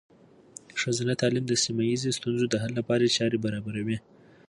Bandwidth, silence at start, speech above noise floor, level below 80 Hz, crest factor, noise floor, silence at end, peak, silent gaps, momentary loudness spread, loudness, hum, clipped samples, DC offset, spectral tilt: 11.5 kHz; 0.75 s; 24 dB; -62 dBFS; 16 dB; -51 dBFS; 0.5 s; -12 dBFS; none; 10 LU; -27 LUFS; none; under 0.1%; under 0.1%; -4.5 dB/octave